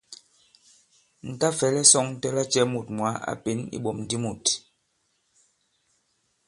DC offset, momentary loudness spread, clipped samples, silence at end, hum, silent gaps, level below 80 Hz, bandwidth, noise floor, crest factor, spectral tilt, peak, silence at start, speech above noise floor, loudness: under 0.1%; 14 LU; under 0.1%; 1.9 s; none; none; -64 dBFS; 11.5 kHz; -72 dBFS; 28 dB; -3 dB/octave; 0 dBFS; 0.1 s; 47 dB; -23 LUFS